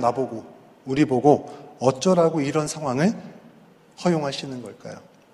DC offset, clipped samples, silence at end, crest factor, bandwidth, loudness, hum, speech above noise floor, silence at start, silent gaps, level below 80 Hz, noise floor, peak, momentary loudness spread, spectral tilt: under 0.1%; under 0.1%; 0.35 s; 22 dB; 12.5 kHz; -22 LUFS; none; 30 dB; 0 s; none; -60 dBFS; -52 dBFS; -2 dBFS; 21 LU; -6 dB/octave